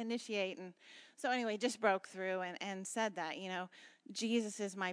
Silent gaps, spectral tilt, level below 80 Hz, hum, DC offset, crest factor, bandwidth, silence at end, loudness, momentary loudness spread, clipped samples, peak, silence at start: none; -3.5 dB/octave; under -90 dBFS; none; under 0.1%; 22 dB; 11 kHz; 0 s; -39 LUFS; 15 LU; under 0.1%; -18 dBFS; 0 s